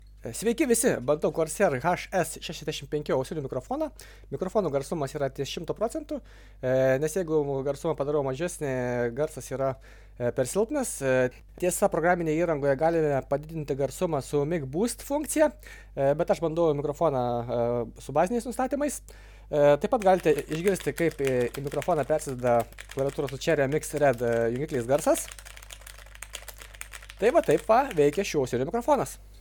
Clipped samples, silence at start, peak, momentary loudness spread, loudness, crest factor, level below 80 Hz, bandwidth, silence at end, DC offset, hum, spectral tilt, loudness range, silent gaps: under 0.1%; 0 s; -8 dBFS; 11 LU; -27 LUFS; 18 dB; -48 dBFS; 19 kHz; 0 s; under 0.1%; 50 Hz at -50 dBFS; -5 dB/octave; 4 LU; none